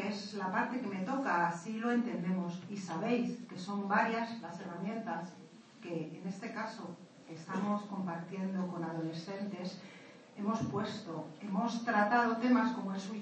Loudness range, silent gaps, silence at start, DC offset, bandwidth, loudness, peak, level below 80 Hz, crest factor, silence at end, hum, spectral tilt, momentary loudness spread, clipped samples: 7 LU; none; 0 s; under 0.1%; 8.4 kHz; -36 LUFS; -18 dBFS; -82 dBFS; 18 dB; 0 s; none; -6 dB/octave; 15 LU; under 0.1%